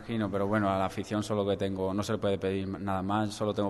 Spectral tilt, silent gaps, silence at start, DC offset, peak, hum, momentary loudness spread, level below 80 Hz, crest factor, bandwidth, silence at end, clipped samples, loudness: -6.5 dB/octave; none; 0 s; under 0.1%; -14 dBFS; none; 5 LU; -60 dBFS; 16 dB; 12.5 kHz; 0 s; under 0.1%; -31 LUFS